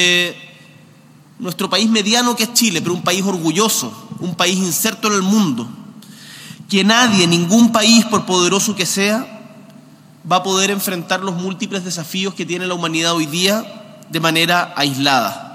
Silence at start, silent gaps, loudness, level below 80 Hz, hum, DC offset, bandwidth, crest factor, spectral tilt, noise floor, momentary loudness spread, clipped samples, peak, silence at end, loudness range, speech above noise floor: 0 s; none; -15 LUFS; -68 dBFS; none; under 0.1%; 16.5 kHz; 16 dB; -3 dB/octave; -45 dBFS; 14 LU; under 0.1%; 0 dBFS; 0 s; 6 LU; 29 dB